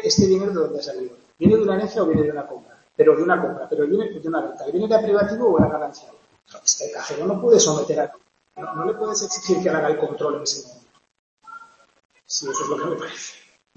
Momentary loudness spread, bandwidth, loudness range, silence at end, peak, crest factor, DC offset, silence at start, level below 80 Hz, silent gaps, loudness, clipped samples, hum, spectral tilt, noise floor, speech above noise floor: 16 LU; 8.2 kHz; 6 LU; 0.4 s; -2 dBFS; 20 dB; under 0.1%; 0 s; -54 dBFS; 11.19-11.37 s, 12.05-12.09 s; -21 LUFS; under 0.1%; none; -4 dB/octave; -44 dBFS; 24 dB